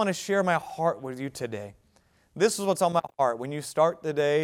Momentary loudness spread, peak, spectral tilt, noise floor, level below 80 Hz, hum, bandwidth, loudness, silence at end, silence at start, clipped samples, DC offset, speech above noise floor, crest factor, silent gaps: 11 LU; -10 dBFS; -4.5 dB/octave; -64 dBFS; -68 dBFS; none; 17 kHz; -27 LUFS; 0 s; 0 s; under 0.1%; under 0.1%; 38 dB; 18 dB; none